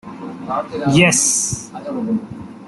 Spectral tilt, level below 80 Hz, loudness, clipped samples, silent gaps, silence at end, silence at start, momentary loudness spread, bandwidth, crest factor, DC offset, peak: -3.5 dB/octave; -50 dBFS; -17 LUFS; under 0.1%; none; 0 s; 0.05 s; 18 LU; 12.5 kHz; 18 dB; under 0.1%; -2 dBFS